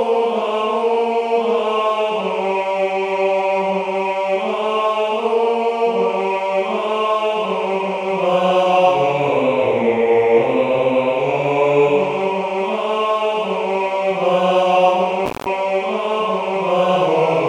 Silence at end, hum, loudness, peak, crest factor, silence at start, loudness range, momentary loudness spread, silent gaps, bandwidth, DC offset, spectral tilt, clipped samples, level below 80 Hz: 0 s; none; -17 LUFS; -2 dBFS; 14 dB; 0 s; 3 LU; 5 LU; none; 10.5 kHz; under 0.1%; -5.5 dB/octave; under 0.1%; -60 dBFS